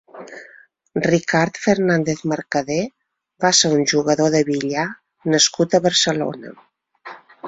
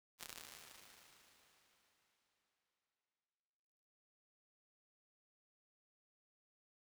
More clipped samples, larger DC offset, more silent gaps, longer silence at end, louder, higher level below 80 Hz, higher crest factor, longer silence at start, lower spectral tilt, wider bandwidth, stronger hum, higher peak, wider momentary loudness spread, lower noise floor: neither; neither; neither; second, 0 s vs 4.8 s; first, -18 LUFS vs -55 LUFS; first, -58 dBFS vs -90 dBFS; second, 18 dB vs 42 dB; about the same, 0.15 s vs 0.2 s; first, -3.5 dB/octave vs 0 dB/octave; second, 8.4 kHz vs over 20 kHz; neither; first, -2 dBFS vs -24 dBFS; first, 22 LU vs 16 LU; second, -41 dBFS vs under -90 dBFS